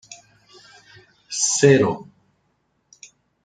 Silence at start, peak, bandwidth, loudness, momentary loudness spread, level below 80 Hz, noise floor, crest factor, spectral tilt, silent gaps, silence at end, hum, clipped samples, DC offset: 0.1 s; -2 dBFS; 9.6 kHz; -18 LUFS; 16 LU; -62 dBFS; -68 dBFS; 22 dB; -4 dB/octave; none; 1.45 s; none; under 0.1%; under 0.1%